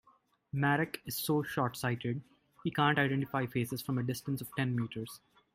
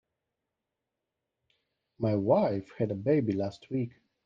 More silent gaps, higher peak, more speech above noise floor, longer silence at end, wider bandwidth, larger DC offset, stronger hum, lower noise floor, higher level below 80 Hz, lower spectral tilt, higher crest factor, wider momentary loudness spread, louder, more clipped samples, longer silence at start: neither; about the same, -14 dBFS vs -12 dBFS; second, 36 dB vs 58 dB; about the same, 0.4 s vs 0.35 s; first, 16 kHz vs 7.6 kHz; neither; neither; second, -69 dBFS vs -87 dBFS; about the same, -68 dBFS vs -70 dBFS; second, -5.5 dB/octave vs -9.5 dB/octave; about the same, 20 dB vs 20 dB; about the same, 11 LU vs 9 LU; second, -34 LUFS vs -30 LUFS; neither; second, 0.55 s vs 2 s